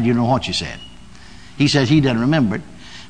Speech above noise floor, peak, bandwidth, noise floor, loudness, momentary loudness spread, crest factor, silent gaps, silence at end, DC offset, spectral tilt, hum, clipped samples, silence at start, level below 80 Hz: 25 dB; -2 dBFS; 10 kHz; -41 dBFS; -17 LUFS; 16 LU; 16 dB; none; 0.05 s; 0.9%; -6 dB/octave; none; under 0.1%; 0 s; -44 dBFS